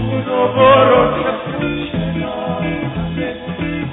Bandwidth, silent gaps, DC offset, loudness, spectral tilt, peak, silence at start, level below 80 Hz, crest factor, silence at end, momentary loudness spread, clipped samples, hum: 4 kHz; none; under 0.1%; -16 LUFS; -10.5 dB/octave; 0 dBFS; 0 s; -36 dBFS; 16 dB; 0 s; 12 LU; under 0.1%; none